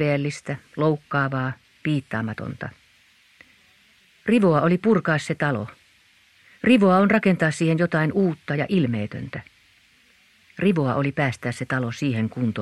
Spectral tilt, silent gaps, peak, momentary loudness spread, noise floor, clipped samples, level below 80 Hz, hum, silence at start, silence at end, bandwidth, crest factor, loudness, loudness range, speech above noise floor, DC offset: -7 dB/octave; none; -4 dBFS; 14 LU; -58 dBFS; under 0.1%; -60 dBFS; none; 0 s; 0 s; 12 kHz; 18 dB; -22 LUFS; 7 LU; 36 dB; under 0.1%